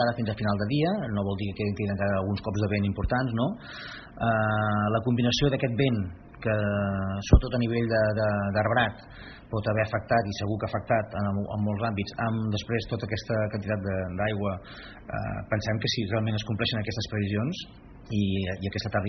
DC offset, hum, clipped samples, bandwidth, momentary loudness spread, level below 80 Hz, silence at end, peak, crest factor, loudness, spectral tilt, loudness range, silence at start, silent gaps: under 0.1%; none; under 0.1%; 6.4 kHz; 9 LU; -40 dBFS; 0 s; -6 dBFS; 20 dB; -28 LUFS; -5.5 dB/octave; 4 LU; 0 s; none